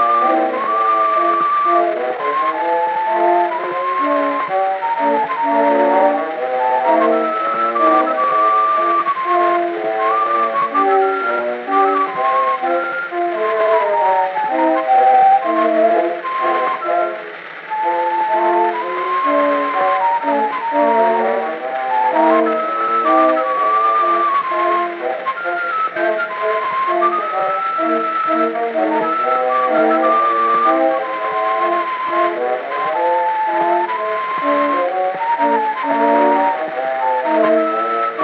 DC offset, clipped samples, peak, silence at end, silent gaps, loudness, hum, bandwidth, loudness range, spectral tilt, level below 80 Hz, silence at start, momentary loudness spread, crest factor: under 0.1%; under 0.1%; -2 dBFS; 0 s; none; -16 LUFS; none; 5.8 kHz; 3 LU; -6.5 dB/octave; -80 dBFS; 0 s; 6 LU; 14 dB